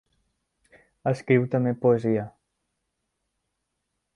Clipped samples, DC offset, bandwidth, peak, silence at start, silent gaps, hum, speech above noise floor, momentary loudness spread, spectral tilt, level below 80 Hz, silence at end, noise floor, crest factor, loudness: under 0.1%; under 0.1%; 10.5 kHz; -6 dBFS; 1.05 s; none; none; 57 dB; 8 LU; -9 dB/octave; -66 dBFS; 1.85 s; -80 dBFS; 22 dB; -24 LUFS